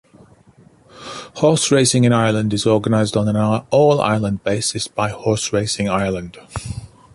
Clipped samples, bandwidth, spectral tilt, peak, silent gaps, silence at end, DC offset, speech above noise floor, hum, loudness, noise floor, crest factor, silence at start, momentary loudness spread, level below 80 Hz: under 0.1%; 11.5 kHz; -5 dB/octave; -2 dBFS; none; 0.25 s; under 0.1%; 33 dB; none; -17 LUFS; -49 dBFS; 16 dB; 0.95 s; 17 LU; -46 dBFS